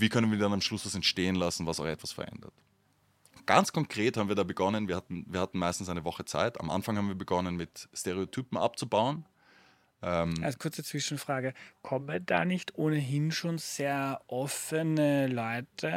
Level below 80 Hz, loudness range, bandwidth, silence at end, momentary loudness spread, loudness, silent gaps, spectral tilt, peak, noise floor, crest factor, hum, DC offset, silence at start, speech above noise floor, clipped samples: -62 dBFS; 3 LU; 16.5 kHz; 0 s; 9 LU; -31 LUFS; none; -5 dB/octave; -6 dBFS; -70 dBFS; 26 dB; none; under 0.1%; 0 s; 38 dB; under 0.1%